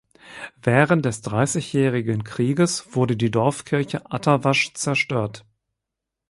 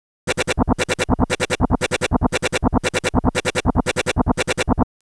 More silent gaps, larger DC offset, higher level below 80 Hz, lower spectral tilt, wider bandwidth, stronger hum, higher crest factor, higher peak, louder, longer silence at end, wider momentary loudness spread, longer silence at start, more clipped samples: neither; second, under 0.1% vs 0.4%; second, -56 dBFS vs -30 dBFS; about the same, -5.5 dB/octave vs -4.5 dB/octave; about the same, 11.5 kHz vs 11 kHz; neither; about the same, 20 dB vs 18 dB; about the same, -4 dBFS vs -2 dBFS; about the same, -21 LUFS vs -20 LUFS; first, 0.9 s vs 0.25 s; first, 8 LU vs 1 LU; about the same, 0.25 s vs 0.25 s; neither